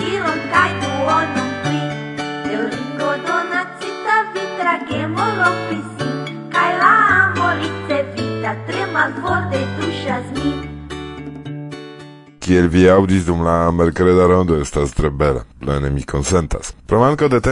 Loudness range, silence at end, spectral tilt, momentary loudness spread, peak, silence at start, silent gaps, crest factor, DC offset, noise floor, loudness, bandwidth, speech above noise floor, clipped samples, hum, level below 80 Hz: 6 LU; 0 s; -6 dB/octave; 14 LU; 0 dBFS; 0 s; none; 16 dB; under 0.1%; -38 dBFS; -17 LUFS; 11 kHz; 24 dB; under 0.1%; none; -36 dBFS